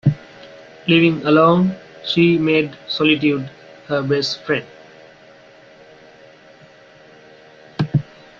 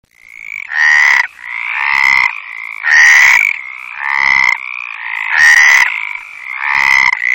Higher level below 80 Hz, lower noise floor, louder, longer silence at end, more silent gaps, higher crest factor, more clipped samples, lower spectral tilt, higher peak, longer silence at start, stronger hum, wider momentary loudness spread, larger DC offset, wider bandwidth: about the same, -56 dBFS vs -52 dBFS; first, -46 dBFS vs -32 dBFS; second, -17 LUFS vs -8 LUFS; first, 0.4 s vs 0 s; neither; first, 18 dB vs 12 dB; neither; first, -7 dB/octave vs 2 dB/octave; about the same, -2 dBFS vs 0 dBFS; second, 0.05 s vs 0.3 s; neither; second, 12 LU vs 18 LU; neither; second, 7.4 kHz vs 16.5 kHz